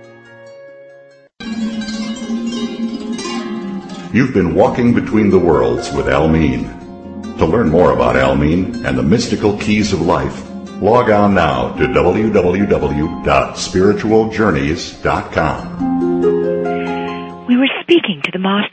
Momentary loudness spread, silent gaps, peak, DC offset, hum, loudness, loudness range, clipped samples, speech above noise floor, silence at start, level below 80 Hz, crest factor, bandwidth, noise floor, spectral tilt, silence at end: 11 LU; none; 0 dBFS; under 0.1%; none; -15 LUFS; 5 LU; under 0.1%; 30 dB; 0 s; -34 dBFS; 14 dB; 8.8 kHz; -43 dBFS; -6 dB/octave; 0.05 s